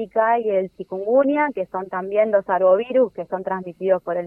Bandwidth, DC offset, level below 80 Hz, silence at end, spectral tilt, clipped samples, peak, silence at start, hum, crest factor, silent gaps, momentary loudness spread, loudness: 3.5 kHz; under 0.1%; -66 dBFS; 0 s; -9 dB/octave; under 0.1%; -6 dBFS; 0 s; none; 14 dB; none; 10 LU; -21 LUFS